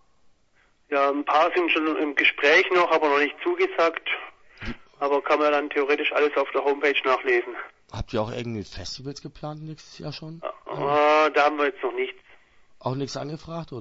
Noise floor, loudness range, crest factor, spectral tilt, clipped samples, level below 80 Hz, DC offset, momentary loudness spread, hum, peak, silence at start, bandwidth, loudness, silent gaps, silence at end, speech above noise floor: -62 dBFS; 8 LU; 18 dB; -5 dB/octave; under 0.1%; -52 dBFS; under 0.1%; 18 LU; none; -6 dBFS; 0.9 s; 7.8 kHz; -23 LUFS; none; 0 s; 38 dB